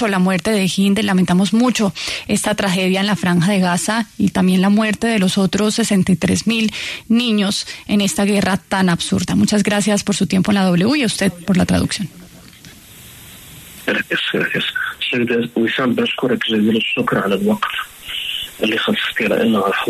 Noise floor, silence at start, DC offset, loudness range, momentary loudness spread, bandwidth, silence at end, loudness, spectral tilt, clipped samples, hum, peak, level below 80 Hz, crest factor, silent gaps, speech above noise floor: -41 dBFS; 0 s; under 0.1%; 5 LU; 7 LU; 13.5 kHz; 0 s; -17 LUFS; -4.5 dB/octave; under 0.1%; none; -2 dBFS; -46 dBFS; 14 dB; none; 24 dB